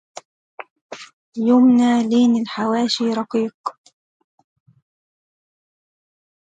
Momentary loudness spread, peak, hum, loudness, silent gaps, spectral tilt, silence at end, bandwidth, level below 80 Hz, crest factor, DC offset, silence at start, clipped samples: 24 LU; -6 dBFS; none; -17 LUFS; 0.70-0.89 s, 1.13-1.33 s, 3.54-3.64 s; -5 dB/octave; 2.85 s; 8.8 kHz; -72 dBFS; 16 dB; under 0.1%; 0.6 s; under 0.1%